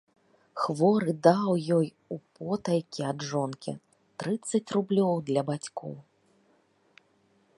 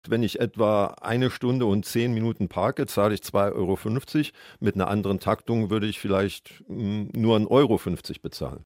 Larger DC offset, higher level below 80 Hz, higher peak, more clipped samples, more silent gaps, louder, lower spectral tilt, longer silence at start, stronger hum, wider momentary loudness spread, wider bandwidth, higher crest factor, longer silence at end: neither; second, -74 dBFS vs -54 dBFS; about the same, -6 dBFS vs -6 dBFS; neither; neither; second, -28 LUFS vs -25 LUFS; about the same, -6.5 dB/octave vs -6.5 dB/octave; first, 0.55 s vs 0.05 s; neither; first, 18 LU vs 9 LU; second, 11.5 kHz vs 16.5 kHz; first, 24 dB vs 18 dB; first, 1.55 s vs 0.05 s